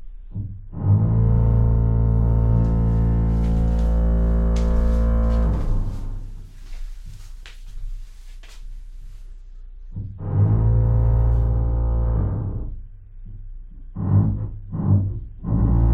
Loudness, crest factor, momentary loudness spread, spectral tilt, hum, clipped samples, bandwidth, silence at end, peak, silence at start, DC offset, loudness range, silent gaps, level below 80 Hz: -21 LUFS; 12 dB; 23 LU; -10 dB/octave; none; under 0.1%; 3.9 kHz; 0 s; -8 dBFS; 0 s; under 0.1%; 19 LU; none; -22 dBFS